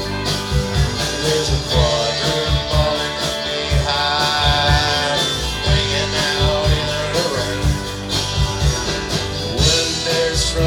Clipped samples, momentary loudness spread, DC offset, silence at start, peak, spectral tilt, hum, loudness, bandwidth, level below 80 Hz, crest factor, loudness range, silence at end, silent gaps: under 0.1%; 6 LU; under 0.1%; 0 s; -2 dBFS; -3.5 dB/octave; none; -17 LUFS; 18.5 kHz; -26 dBFS; 16 dB; 2 LU; 0 s; none